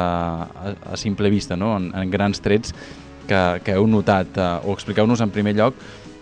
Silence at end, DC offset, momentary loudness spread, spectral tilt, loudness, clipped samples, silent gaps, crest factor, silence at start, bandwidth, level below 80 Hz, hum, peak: 0 s; under 0.1%; 14 LU; -6.5 dB/octave; -20 LUFS; under 0.1%; none; 18 dB; 0 s; 9.6 kHz; -44 dBFS; none; -2 dBFS